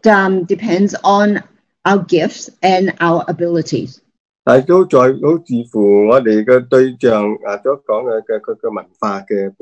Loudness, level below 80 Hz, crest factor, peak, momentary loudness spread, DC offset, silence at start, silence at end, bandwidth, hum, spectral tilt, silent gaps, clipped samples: -14 LUFS; -58 dBFS; 14 dB; 0 dBFS; 11 LU; under 0.1%; 0.05 s; 0.1 s; 8.4 kHz; none; -6.5 dB/octave; 4.20-4.43 s; 0.2%